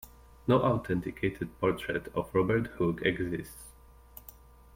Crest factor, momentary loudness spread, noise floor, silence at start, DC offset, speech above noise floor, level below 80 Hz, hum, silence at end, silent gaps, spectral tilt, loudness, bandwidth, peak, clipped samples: 20 dB; 22 LU; -53 dBFS; 0.05 s; under 0.1%; 24 dB; -52 dBFS; none; 0.45 s; none; -7 dB/octave; -31 LUFS; 16.5 kHz; -12 dBFS; under 0.1%